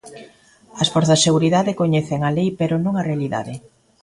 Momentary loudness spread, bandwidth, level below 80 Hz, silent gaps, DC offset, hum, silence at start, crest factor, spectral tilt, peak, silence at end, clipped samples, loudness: 10 LU; 11.5 kHz; -54 dBFS; none; under 0.1%; none; 0.05 s; 18 dB; -5 dB/octave; -2 dBFS; 0.45 s; under 0.1%; -19 LUFS